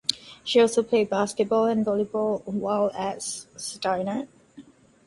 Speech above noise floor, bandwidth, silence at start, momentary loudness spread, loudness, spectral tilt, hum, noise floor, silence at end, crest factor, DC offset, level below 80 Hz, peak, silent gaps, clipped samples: 26 dB; 11.5 kHz; 0.1 s; 12 LU; -25 LUFS; -4 dB/octave; none; -50 dBFS; 0.45 s; 24 dB; under 0.1%; -66 dBFS; 0 dBFS; none; under 0.1%